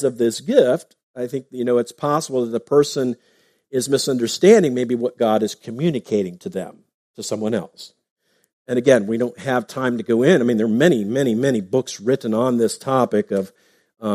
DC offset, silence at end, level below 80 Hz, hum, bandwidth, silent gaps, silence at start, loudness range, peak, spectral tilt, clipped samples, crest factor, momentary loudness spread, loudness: under 0.1%; 0 s; -66 dBFS; none; 15.5 kHz; 1.03-1.14 s, 6.94-7.14 s, 8.10-8.16 s, 8.53-8.65 s; 0 s; 5 LU; 0 dBFS; -5.5 dB/octave; under 0.1%; 20 dB; 12 LU; -19 LUFS